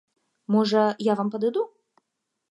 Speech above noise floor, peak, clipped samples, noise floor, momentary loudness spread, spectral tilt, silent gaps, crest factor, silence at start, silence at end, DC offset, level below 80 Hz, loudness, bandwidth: 57 dB; -8 dBFS; under 0.1%; -80 dBFS; 11 LU; -6.5 dB/octave; none; 18 dB; 0.5 s; 0.85 s; under 0.1%; -80 dBFS; -24 LUFS; 11 kHz